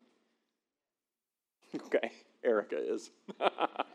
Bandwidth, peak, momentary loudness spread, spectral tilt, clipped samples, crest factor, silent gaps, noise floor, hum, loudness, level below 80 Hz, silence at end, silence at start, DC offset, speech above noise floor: 10.5 kHz; -12 dBFS; 13 LU; -4 dB/octave; under 0.1%; 26 dB; none; under -90 dBFS; none; -35 LUFS; under -90 dBFS; 0.1 s; 1.75 s; under 0.1%; over 56 dB